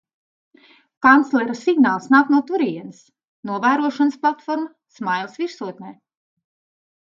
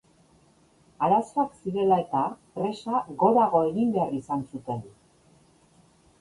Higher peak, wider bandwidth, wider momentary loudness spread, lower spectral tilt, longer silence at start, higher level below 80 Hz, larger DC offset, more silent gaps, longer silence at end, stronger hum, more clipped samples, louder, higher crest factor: first, 0 dBFS vs -8 dBFS; second, 7.4 kHz vs 11.5 kHz; first, 18 LU vs 11 LU; second, -5.5 dB/octave vs -8 dB/octave; about the same, 1 s vs 1 s; second, -70 dBFS vs -64 dBFS; neither; first, 3.28-3.43 s vs none; second, 1.1 s vs 1.3 s; neither; neither; first, -19 LUFS vs -26 LUFS; about the same, 20 dB vs 18 dB